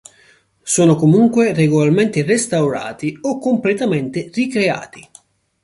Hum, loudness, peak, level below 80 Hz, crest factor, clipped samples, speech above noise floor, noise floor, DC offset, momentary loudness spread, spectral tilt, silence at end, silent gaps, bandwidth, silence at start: none; -16 LUFS; -2 dBFS; -56 dBFS; 14 dB; under 0.1%; 37 dB; -53 dBFS; under 0.1%; 11 LU; -5.5 dB/octave; 0.6 s; none; 11.5 kHz; 0.65 s